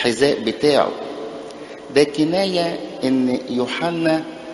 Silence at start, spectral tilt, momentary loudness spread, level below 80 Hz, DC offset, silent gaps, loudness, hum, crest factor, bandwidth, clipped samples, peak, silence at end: 0 s; -5 dB/octave; 14 LU; -58 dBFS; under 0.1%; none; -19 LUFS; none; 18 dB; 11.5 kHz; under 0.1%; 0 dBFS; 0 s